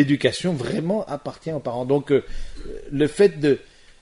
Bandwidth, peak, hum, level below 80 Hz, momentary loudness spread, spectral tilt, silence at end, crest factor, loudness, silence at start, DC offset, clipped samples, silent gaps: 11 kHz; -4 dBFS; none; -40 dBFS; 16 LU; -6.5 dB/octave; 0.4 s; 18 dB; -22 LUFS; 0 s; under 0.1%; under 0.1%; none